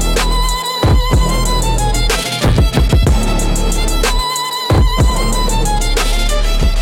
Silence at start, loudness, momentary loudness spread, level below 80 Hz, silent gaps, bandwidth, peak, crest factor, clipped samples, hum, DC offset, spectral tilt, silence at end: 0 s; -15 LUFS; 4 LU; -14 dBFS; none; 17 kHz; -2 dBFS; 10 dB; under 0.1%; none; under 0.1%; -4 dB/octave; 0 s